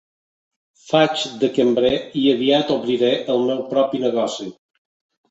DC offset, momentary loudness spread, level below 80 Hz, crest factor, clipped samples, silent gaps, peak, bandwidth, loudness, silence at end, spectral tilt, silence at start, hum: under 0.1%; 5 LU; -58 dBFS; 18 dB; under 0.1%; none; -2 dBFS; 8.2 kHz; -19 LUFS; 0.8 s; -5 dB/octave; 0.85 s; none